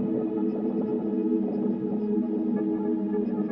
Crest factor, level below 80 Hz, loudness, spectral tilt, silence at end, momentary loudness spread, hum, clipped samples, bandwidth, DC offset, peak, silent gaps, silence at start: 12 dB; -68 dBFS; -27 LUFS; -12 dB/octave; 0 s; 2 LU; none; under 0.1%; 3.6 kHz; under 0.1%; -14 dBFS; none; 0 s